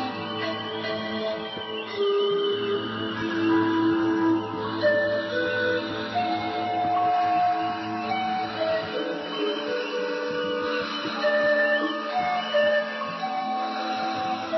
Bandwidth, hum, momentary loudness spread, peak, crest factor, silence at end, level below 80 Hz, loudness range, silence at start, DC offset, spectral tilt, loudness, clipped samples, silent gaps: 6 kHz; none; 7 LU; -12 dBFS; 12 dB; 0 s; -64 dBFS; 3 LU; 0 s; under 0.1%; -5.5 dB/octave; -26 LUFS; under 0.1%; none